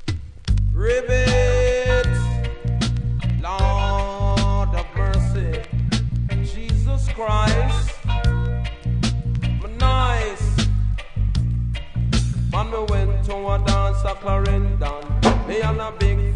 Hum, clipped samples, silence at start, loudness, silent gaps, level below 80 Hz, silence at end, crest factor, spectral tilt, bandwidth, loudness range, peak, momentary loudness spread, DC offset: none; under 0.1%; 0 s; -21 LUFS; none; -22 dBFS; 0 s; 16 dB; -6 dB/octave; 10.5 kHz; 2 LU; -4 dBFS; 6 LU; under 0.1%